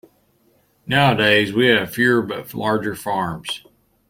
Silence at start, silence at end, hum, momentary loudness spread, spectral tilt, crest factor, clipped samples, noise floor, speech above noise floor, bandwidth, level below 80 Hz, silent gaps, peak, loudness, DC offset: 0.85 s; 0.5 s; none; 13 LU; -5 dB/octave; 18 dB; under 0.1%; -60 dBFS; 42 dB; 16.5 kHz; -56 dBFS; none; -2 dBFS; -18 LUFS; under 0.1%